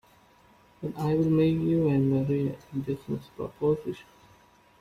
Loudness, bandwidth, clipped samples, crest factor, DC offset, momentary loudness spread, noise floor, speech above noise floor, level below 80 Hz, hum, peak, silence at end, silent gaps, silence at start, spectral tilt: -27 LUFS; 14.5 kHz; under 0.1%; 14 dB; under 0.1%; 15 LU; -59 dBFS; 32 dB; -58 dBFS; none; -14 dBFS; 0.8 s; none; 0.8 s; -9.5 dB/octave